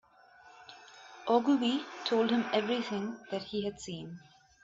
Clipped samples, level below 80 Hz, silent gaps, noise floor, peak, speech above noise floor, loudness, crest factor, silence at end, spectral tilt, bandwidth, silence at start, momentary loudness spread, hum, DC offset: under 0.1%; -72 dBFS; none; -59 dBFS; -14 dBFS; 27 dB; -32 LUFS; 20 dB; 0.45 s; -5 dB/octave; 8 kHz; 0.45 s; 23 LU; none; under 0.1%